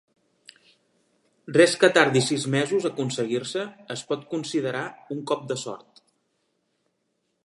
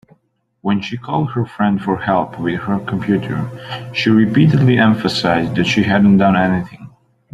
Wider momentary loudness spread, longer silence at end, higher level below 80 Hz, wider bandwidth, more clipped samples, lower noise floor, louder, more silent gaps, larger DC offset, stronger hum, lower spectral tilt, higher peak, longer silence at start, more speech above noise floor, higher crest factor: first, 16 LU vs 11 LU; first, 1.7 s vs 0.45 s; second, -76 dBFS vs -48 dBFS; about the same, 11.5 kHz vs 11 kHz; neither; first, -75 dBFS vs -62 dBFS; second, -24 LUFS vs -16 LUFS; neither; neither; neither; second, -4.5 dB/octave vs -7 dB/octave; about the same, -2 dBFS vs -2 dBFS; first, 1.45 s vs 0.65 s; first, 51 dB vs 47 dB; first, 24 dB vs 14 dB